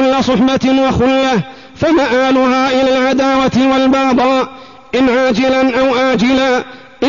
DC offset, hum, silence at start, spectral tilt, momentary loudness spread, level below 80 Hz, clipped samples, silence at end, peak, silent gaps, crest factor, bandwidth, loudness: 0.5%; none; 0 s; -5.5 dB/octave; 6 LU; -40 dBFS; under 0.1%; 0 s; -4 dBFS; none; 8 dB; 7.4 kHz; -12 LUFS